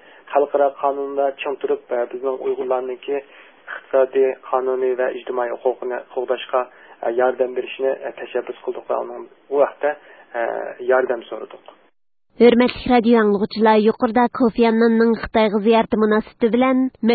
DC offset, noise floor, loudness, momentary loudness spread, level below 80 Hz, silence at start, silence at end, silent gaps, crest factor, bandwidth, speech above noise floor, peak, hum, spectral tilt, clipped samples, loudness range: under 0.1%; -65 dBFS; -19 LUFS; 12 LU; -52 dBFS; 0.3 s; 0 s; none; 18 dB; 4.8 kHz; 46 dB; -2 dBFS; none; -11 dB/octave; under 0.1%; 7 LU